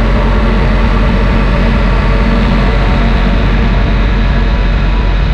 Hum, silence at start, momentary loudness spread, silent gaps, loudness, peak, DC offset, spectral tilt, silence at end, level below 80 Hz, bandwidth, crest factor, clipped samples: none; 0 s; 2 LU; none; -12 LUFS; 0 dBFS; under 0.1%; -7.5 dB/octave; 0 s; -10 dBFS; 6.2 kHz; 8 dB; under 0.1%